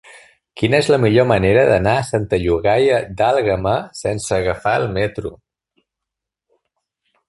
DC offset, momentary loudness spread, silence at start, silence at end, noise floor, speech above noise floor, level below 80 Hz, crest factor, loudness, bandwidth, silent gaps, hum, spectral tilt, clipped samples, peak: under 0.1%; 9 LU; 0.55 s; 1.95 s; -83 dBFS; 67 dB; -40 dBFS; 18 dB; -17 LUFS; 11.5 kHz; none; none; -6 dB/octave; under 0.1%; 0 dBFS